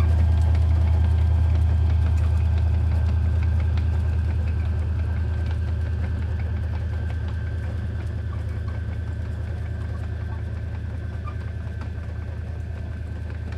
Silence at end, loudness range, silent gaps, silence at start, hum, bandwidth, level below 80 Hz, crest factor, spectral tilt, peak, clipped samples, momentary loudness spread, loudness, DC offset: 0 s; 9 LU; none; 0 s; none; 5.2 kHz; -28 dBFS; 12 dB; -8.5 dB/octave; -12 dBFS; under 0.1%; 11 LU; -25 LUFS; under 0.1%